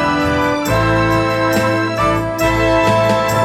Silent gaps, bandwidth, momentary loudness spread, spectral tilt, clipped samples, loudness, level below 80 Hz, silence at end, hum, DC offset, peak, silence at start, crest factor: none; 17.5 kHz; 3 LU; -5.5 dB/octave; under 0.1%; -15 LUFS; -32 dBFS; 0 s; none; under 0.1%; -2 dBFS; 0 s; 12 dB